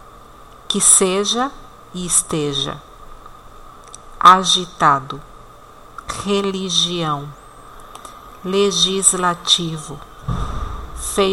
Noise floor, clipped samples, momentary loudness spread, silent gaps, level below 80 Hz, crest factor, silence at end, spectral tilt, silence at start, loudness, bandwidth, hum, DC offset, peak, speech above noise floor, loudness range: -41 dBFS; under 0.1%; 23 LU; none; -38 dBFS; 20 dB; 0 s; -2 dB/octave; 0.15 s; -16 LUFS; 16.5 kHz; none; under 0.1%; 0 dBFS; 24 dB; 5 LU